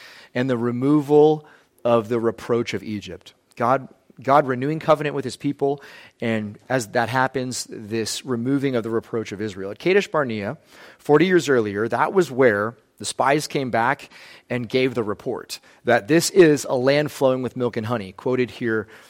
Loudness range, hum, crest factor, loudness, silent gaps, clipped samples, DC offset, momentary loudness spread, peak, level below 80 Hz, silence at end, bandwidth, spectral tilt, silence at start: 4 LU; none; 18 dB; -21 LUFS; none; under 0.1%; under 0.1%; 13 LU; -4 dBFS; -64 dBFS; 0.1 s; 16.5 kHz; -5.5 dB/octave; 0 s